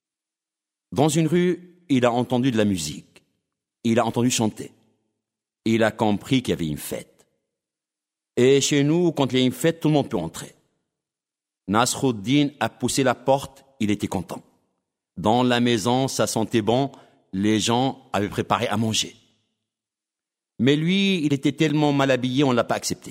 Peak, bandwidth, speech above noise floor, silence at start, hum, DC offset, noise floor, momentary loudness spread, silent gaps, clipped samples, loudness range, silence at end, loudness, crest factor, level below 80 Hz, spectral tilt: -4 dBFS; 16 kHz; 68 dB; 0.9 s; none; under 0.1%; -89 dBFS; 11 LU; none; under 0.1%; 3 LU; 0 s; -22 LUFS; 20 dB; -58 dBFS; -5 dB/octave